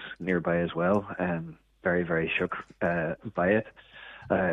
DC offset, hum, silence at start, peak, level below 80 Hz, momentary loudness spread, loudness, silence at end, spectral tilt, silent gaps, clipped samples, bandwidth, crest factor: under 0.1%; none; 0 s; -12 dBFS; -58 dBFS; 17 LU; -29 LUFS; 0 s; -8.5 dB/octave; none; under 0.1%; 6 kHz; 18 dB